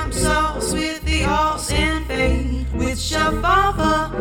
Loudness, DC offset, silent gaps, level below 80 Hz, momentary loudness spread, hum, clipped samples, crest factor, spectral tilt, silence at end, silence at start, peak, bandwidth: -19 LUFS; under 0.1%; none; -26 dBFS; 6 LU; none; under 0.1%; 16 dB; -4 dB/octave; 0 s; 0 s; -4 dBFS; 17.5 kHz